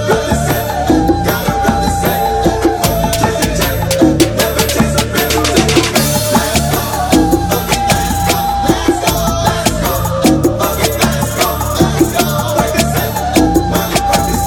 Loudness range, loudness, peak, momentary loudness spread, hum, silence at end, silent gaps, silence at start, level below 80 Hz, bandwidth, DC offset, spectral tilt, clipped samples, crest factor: 1 LU; -13 LUFS; 0 dBFS; 3 LU; none; 0 s; none; 0 s; -24 dBFS; over 20 kHz; under 0.1%; -4.5 dB/octave; 0.2%; 12 dB